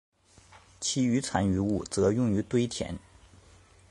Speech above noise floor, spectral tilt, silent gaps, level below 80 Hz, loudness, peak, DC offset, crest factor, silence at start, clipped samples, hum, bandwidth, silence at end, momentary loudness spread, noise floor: 29 dB; -5.5 dB/octave; none; -50 dBFS; -28 LUFS; -10 dBFS; under 0.1%; 20 dB; 0.55 s; under 0.1%; none; 11.5 kHz; 0.9 s; 9 LU; -57 dBFS